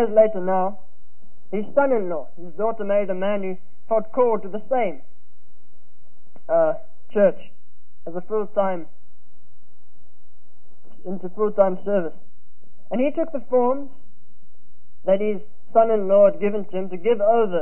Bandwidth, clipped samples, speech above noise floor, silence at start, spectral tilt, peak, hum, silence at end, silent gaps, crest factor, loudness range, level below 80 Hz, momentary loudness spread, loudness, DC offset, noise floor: 3.2 kHz; under 0.1%; 34 dB; 0 s; -11.5 dB/octave; -4 dBFS; none; 0 s; none; 18 dB; 7 LU; -66 dBFS; 15 LU; -22 LUFS; 7%; -55 dBFS